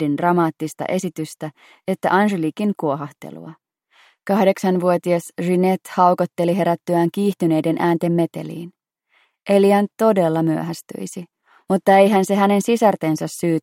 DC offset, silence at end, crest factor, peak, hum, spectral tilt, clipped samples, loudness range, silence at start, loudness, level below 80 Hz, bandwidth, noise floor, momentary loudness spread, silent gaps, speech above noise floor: under 0.1%; 0.05 s; 18 dB; -2 dBFS; none; -6.5 dB/octave; under 0.1%; 4 LU; 0 s; -18 LUFS; -68 dBFS; 16.5 kHz; -62 dBFS; 17 LU; none; 44 dB